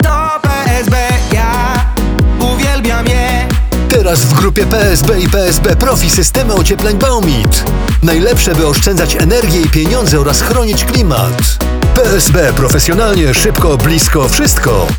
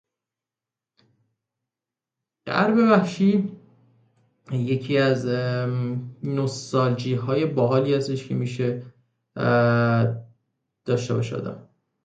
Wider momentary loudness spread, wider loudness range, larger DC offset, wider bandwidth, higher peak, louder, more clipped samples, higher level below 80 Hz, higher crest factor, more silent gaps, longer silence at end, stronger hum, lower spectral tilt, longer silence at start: second, 4 LU vs 13 LU; about the same, 2 LU vs 2 LU; neither; first, over 20 kHz vs 9 kHz; first, 0 dBFS vs -4 dBFS; first, -10 LUFS vs -23 LUFS; neither; first, -14 dBFS vs -62 dBFS; second, 10 dB vs 20 dB; neither; second, 0 s vs 0.4 s; neither; second, -4.5 dB/octave vs -7 dB/octave; second, 0 s vs 2.45 s